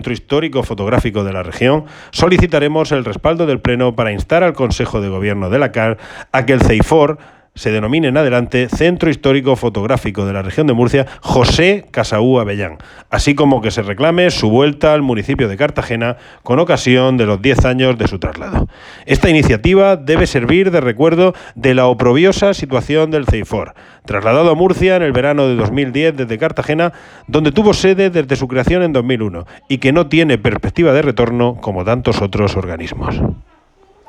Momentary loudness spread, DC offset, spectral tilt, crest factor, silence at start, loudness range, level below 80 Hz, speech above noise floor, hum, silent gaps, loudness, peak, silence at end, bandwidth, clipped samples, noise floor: 9 LU; under 0.1%; -6.5 dB/octave; 12 dB; 0 s; 2 LU; -30 dBFS; 36 dB; none; none; -13 LUFS; 0 dBFS; 0.65 s; 12.5 kHz; under 0.1%; -49 dBFS